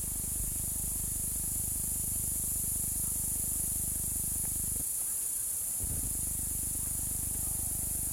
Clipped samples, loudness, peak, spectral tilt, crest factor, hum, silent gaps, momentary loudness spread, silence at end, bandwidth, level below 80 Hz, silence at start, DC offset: under 0.1%; -31 LUFS; -20 dBFS; -2.5 dB/octave; 14 dB; none; none; 2 LU; 0 s; 16.5 kHz; -44 dBFS; 0 s; under 0.1%